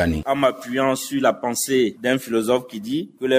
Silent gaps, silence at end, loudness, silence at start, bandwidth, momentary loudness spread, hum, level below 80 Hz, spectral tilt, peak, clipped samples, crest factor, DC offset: none; 0 s; -21 LUFS; 0 s; 16 kHz; 6 LU; none; -44 dBFS; -4 dB/octave; -4 dBFS; under 0.1%; 18 dB; under 0.1%